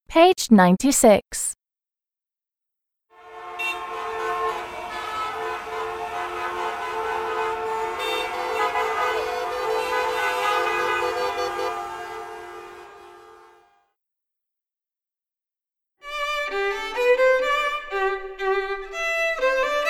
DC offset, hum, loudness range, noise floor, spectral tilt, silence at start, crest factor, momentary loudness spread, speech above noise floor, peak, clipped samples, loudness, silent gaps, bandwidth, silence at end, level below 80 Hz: under 0.1%; none; 11 LU; under -90 dBFS; -4 dB/octave; 0.1 s; 22 dB; 15 LU; over 74 dB; -2 dBFS; under 0.1%; -23 LUFS; none; 17.5 kHz; 0 s; -52 dBFS